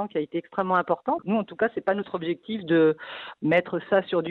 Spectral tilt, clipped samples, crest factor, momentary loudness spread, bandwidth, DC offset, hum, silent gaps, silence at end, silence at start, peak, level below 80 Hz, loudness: -9 dB/octave; under 0.1%; 18 dB; 9 LU; 4.5 kHz; under 0.1%; none; none; 0 s; 0 s; -8 dBFS; -68 dBFS; -25 LUFS